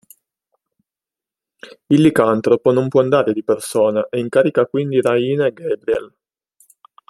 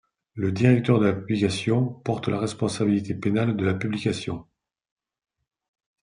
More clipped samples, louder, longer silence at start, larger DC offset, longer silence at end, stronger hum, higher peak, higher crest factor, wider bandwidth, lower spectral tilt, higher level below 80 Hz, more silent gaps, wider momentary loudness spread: neither; first, -16 LUFS vs -24 LUFS; first, 1.65 s vs 0.35 s; neither; second, 1.05 s vs 1.6 s; neither; first, 0 dBFS vs -6 dBFS; about the same, 18 dB vs 20 dB; first, 13 kHz vs 10.5 kHz; about the same, -6.5 dB/octave vs -7 dB/octave; about the same, -58 dBFS vs -60 dBFS; neither; about the same, 7 LU vs 9 LU